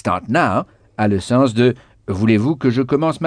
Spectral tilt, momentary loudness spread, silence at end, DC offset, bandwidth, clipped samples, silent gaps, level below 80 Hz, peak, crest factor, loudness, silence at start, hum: -7 dB/octave; 8 LU; 0 s; under 0.1%; 10 kHz; under 0.1%; none; -50 dBFS; -2 dBFS; 14 dB; -17 LUFS; 0.05 s; none